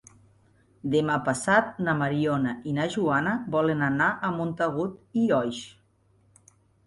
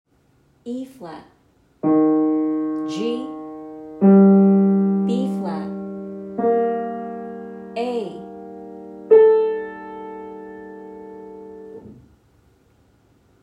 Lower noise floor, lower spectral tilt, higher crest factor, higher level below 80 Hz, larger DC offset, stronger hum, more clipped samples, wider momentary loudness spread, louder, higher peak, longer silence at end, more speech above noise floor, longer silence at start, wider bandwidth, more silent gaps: first, -64 dBFS vs -59 dBFS; second, -6 dB/octave vs -9.5 dB/octave; about the same, 20 dB vs 20 dB; about the same, -62 dBFS vs -64 dBFS; neither; neither; neither; second, 7 LU vs 25 LU; second, -26 LUFS vs -18 LUFS; second, -8 dBFS vs -2 dBFS; second, 1.15 s vs 1.5 s; first, 38 dB vs 32 dB; first, 0.85 s vs 0.65 s; first, 11.5 kHz vs 7.6 kHz; neither